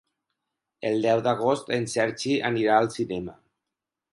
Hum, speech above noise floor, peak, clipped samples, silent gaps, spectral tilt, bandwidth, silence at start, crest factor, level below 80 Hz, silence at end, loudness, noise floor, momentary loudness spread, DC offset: none; 62 dB; -6 dBFS; under 0.1%; none; -5 dB/octave; 11.5 kHz; 0.8 s; 20 dB; -64 dBFS; 0.8 s; -25 LUFS; -87 dBFS; 10 LU; under 0.1%